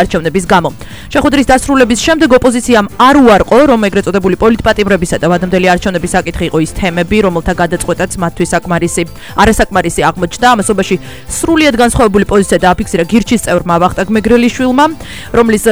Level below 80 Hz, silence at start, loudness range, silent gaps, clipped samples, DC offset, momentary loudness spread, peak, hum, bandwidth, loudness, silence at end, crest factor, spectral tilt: -28 dBFS; 0 s; 4 LU; none; 0.5%; 2%; 7 LU; 0 dBFS; none; over 20 kHz; -10 LUFS; 0 s; 10 dB; -5 dB/octave